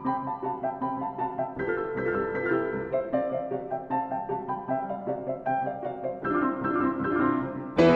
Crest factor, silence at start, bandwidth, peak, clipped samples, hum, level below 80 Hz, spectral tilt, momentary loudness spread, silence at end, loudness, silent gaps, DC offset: 20 dB; 0 s; 8 kHz; -8 dBFS; under 0.1%; none; -56 dBFS; -8 dB/octave; 6 LU; 0 s; -29 LUFS; none; under 0.1%